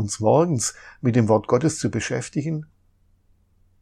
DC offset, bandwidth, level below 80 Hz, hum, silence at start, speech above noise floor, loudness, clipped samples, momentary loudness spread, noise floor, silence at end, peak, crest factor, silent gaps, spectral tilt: under 0.1%; 13.5 kHz; -58 dBFS; none; 0 s; 39 dB; -22 LUFS; under 0.1%; 8 LU; -61 dBFS; 1.15 s; -4 dBFS; 18 dB; none; -5.5 dB/octave